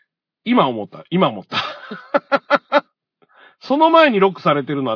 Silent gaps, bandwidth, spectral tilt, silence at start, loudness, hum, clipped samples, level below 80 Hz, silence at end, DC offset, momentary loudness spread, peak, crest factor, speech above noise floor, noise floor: none; 5.4 kHz; -7 dB/octave; 0.45 s; -17 LUFS; none; under 0.1%; -70 dBFS; 0 s; under 0.1%; 12 LU; 0 dBFS; 18 dB; 44 dB; -61 dBFS